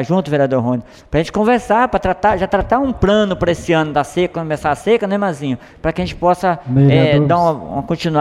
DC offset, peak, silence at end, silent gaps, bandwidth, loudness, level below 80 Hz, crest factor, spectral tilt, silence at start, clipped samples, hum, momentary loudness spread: under 0.1%; -2 dBFS; 0 s; none; 12 kHz; -16 LUFS; -36 dBFS; 14 dB; -7 dB/octave; 0 s; under 0.1%; none; 8 LU